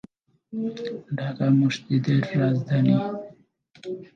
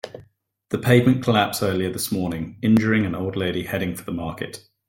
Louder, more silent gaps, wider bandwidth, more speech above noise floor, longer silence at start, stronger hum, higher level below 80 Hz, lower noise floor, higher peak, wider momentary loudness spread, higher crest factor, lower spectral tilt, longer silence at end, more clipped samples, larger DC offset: about the same, -24 LUFS vs -22 LUFS; neither; second, 7.4 kHz vs 17 kHz; second, 28 dB vs 34 dB; first, 0.5 s vs 0.05 s; neither; second, -68 dBFS vs -54 dBFS; second, -51 dBFS vs -55 dBFS; second, -8 dBFS vs -2 dBFS; first, 16 LU vs 13 LU; about the same, 16 dB vs 20 dB; first, -8 dB/octave vs -6 dB/octave; second, 0.1 s vs 0.3 s; neither; neither